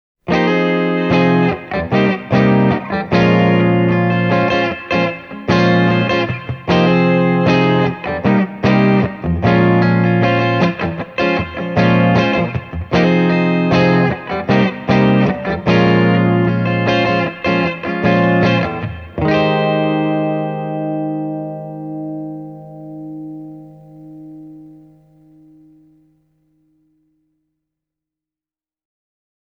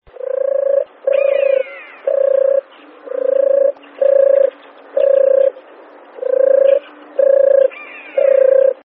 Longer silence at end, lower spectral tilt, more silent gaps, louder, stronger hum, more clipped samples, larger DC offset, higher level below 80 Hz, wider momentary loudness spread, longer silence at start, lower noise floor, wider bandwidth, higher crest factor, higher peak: first, 4.85 s vs 0.15 s; about the same, -8 dB/octave vs -7 dB/octave; neither; about the same, -15 LUFS vs -14 LUFS; neither; neither; neither; first, -42 dBFS vs -70 dBFS; about the same, 13 LU vs 12 LU; about the same, 0.25 s vs 0.25 s; first, under -90 dBFS vs -40 dBFS; first, 6.6 kHz vs 3.7 kHz; about the same, 16 dB vs 12 dB; about the same, 0 dBFS vs -2 dBFS